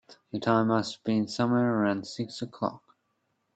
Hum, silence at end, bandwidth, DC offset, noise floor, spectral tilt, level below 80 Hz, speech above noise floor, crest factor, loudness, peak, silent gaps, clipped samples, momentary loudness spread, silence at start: none; 0.8 s; 8.8 kHz; under 0.1%; -76 dBFS; -6.5 dB/octave; -70 dBFS; 49 dB; 20 dB; -28 LUFS; -10 dBFS; none; under 0.1%; 11 LU; 0.1 s